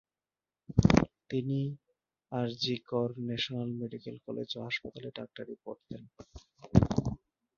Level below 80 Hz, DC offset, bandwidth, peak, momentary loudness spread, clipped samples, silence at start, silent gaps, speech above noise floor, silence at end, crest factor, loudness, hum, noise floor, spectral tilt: -48 dBFS; under 0.1%; 7.4 kHz; -6 dBFS; 18 LU; under 0.1%; 0.7 s; none; over 55 dB; 0.4 s; 28 dB; -32 LUFS; none; under -90 dBFS; -6.5 dB/octave